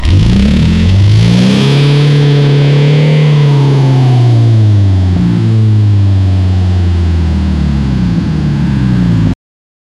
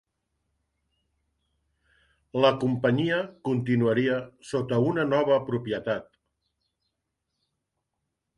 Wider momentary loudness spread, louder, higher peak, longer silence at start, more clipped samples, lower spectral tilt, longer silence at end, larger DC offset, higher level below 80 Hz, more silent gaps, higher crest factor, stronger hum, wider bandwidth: second, 5 LU vs 9 LU; first, -9 LUFS vs -26 LUFS; first, 0 dBFS vs -6 dBFS; second, 0 s vs 2.35 s; neither; about the same, -7.5 dB/octave vs -7.5 dB/octave; second, 0.65 s vs 2.35 s; neither; first, -20 dBFS vs -64 dBFS; neither; second, 8 dB vs 22 dB; neither; about the same, 10.5 kHz vs 11 kHz